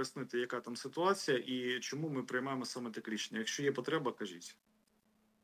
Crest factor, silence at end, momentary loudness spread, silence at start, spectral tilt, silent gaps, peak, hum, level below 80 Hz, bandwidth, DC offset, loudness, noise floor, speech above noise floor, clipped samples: 20 dB; 0.9 s; 9 LU; 0 s; -4 dB/octave; none; -18 dBFS; none; under -90 dBFS; 16 kHz; under 0.1%; -38 LUFS; -75 dBFS; 36 dB; under 0.1%